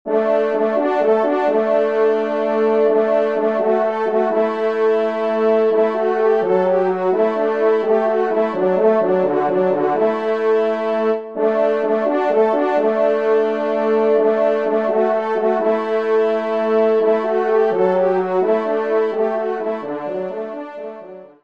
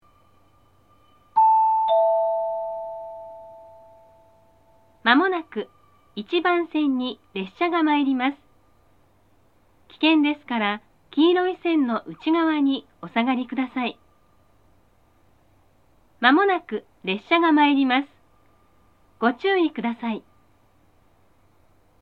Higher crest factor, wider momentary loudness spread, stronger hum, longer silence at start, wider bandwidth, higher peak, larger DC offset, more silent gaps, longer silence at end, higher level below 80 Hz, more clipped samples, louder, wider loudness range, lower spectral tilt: second, 12 dB vs 24 dB; second, 4 LU vs 16 LU; neither; second, 0.05 s vs 1.35 s; first, 6.2 kHz vs 5 kHz; second, -4 dBFS vs 0 dBFS; first, 0.3% vs under 0.1%; neither; second, 0.15 s vs 1.8 s; about the same, -68 dBFS vs -68 dBFS; neither; first, -17 LUFS vs -22 LUFS; second, 1 LU vs 6 LU; about the same, -7.5 dB/octave vs -7 dB/octave